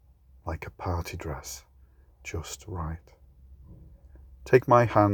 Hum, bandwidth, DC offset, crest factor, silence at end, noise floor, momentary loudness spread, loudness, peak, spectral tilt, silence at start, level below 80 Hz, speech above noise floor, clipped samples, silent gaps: none; 20 kHz; under 0.1%; 24 dB; 0 s; -57 dBFS; 23 LU; -27 LUFS; -6 dBFS; -6.5 dB/octave; 0.45 s; -50 dBFS; 31 dB; under 0.1%; none